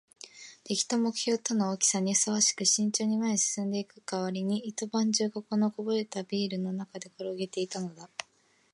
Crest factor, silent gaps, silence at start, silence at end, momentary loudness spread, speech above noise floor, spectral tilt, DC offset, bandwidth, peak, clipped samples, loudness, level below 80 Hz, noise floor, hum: 20 dB; none; 0.25 s; 0.5 s; 14 LU; 37 dB; -3 dB/octave; under 0.1%; 11.5 kHz; -10 dBFS; under 0.1%; -29 LUFS; -82 dBFS; -67 dBFS; none